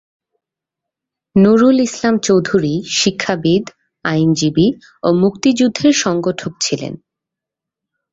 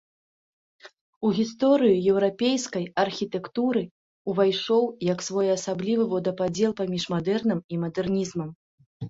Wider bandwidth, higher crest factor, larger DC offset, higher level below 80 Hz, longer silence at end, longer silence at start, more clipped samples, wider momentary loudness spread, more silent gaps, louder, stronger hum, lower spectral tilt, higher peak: about the same, 8 kHz vs 8 kHz; about the same, 14 dB vs 18 dB; neither; first, -52 dBFS vs -62 dBFS; first, 1.15 s vs 0 s; first, 1.35 s vs 0.85 s; neither; about the same, 9 LU vs 9 LU; second, none vs 1.01-1.21 s, 3.91-4.25 s, 7.64-7.69 s, 8.55-8.78 s, 8.86-9.00 s; first, -15 LUFS vs -25 LUFS; neither; about the same, -5 dB/octave vs -5.5 dB/octave; first, -2 dBFS vs -8 dBFS